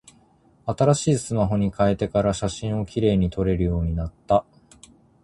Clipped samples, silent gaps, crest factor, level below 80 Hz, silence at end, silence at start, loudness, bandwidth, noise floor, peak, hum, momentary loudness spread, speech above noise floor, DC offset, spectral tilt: under 0.1%; none; 18 dB; -38 dBFS; 0.85 s; 0.65 s; -23 LUFS; 11.5 kHz; -58 dBFS; -4 dBFS; none; 7 LU; 36 dB; under 0.1%; -6.5 dB/octave